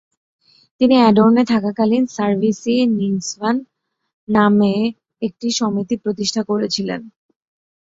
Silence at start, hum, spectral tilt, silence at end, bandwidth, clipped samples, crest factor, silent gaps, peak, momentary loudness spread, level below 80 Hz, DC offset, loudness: 0.8 s; none; -5.5 dB/octave; 0.85 s; 7.8 kHz; under 0.1%; 16 dB; 4.13-4.27 s; -2 dBFS; 11 LU; -58 dBFS; under 0.1%; -17 LUFS